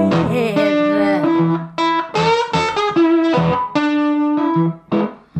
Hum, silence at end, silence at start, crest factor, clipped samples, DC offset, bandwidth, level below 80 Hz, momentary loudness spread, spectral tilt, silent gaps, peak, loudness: none; 0 s; 0 s; 12 dB; under 0.1%; under 0.1%; 8.6 kHz; -50 dBFS; 4 LU; -6.5 dB/octave; none; -4 dBFS; -16 LUFS